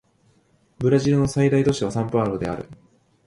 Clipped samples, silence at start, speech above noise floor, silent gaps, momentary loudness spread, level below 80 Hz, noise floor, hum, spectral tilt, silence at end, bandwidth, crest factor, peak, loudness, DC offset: under 0.1%; 0.8 s; 41 dB; none; 11 LU; -48 dBFS; -61 dBFS; none; -7 dB/octave; 0.55 s; 11.5 kHz; 18 dB; -6 dBFS; -21 LUFS; under 0.1%